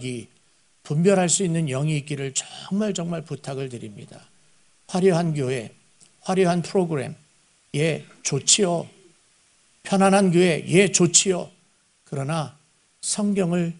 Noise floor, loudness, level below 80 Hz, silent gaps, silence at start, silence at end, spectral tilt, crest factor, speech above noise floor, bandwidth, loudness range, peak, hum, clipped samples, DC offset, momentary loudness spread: -62 dBFS; -22 LUFS; -64 dBFS; none; 0 s; 0 s; -4 dB/octave; 24 dB; 40 dB; 11 kHz; 7 LU; 0 dBFS; none; under 0.1%; under 0.1%; 17 LU